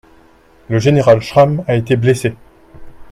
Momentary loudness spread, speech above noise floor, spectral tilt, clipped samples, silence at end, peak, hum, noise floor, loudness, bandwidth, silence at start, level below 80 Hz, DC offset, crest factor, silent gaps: 8 LU; 35 dB; -7 dB/octave; under 0.1%; 0.05 s; 0 dBFS; none; -47 dBFS; -13 LUFS; 14 kHz; 0.7 s; -44 dBFS; under 0.1%; 14 dB; none